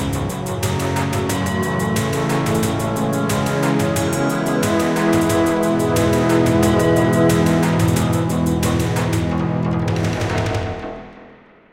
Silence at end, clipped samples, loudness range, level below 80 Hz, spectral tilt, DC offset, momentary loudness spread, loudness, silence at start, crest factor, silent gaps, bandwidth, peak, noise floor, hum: 0.4 s; under 0.1%; 4 LU; -38 dBFS; -6 dB/octave; under 0.1%; 6 LU; -18 LUFS; 0 s; 14 dB; none; 17 kHz; -4 dBFS; -45 dBFS; none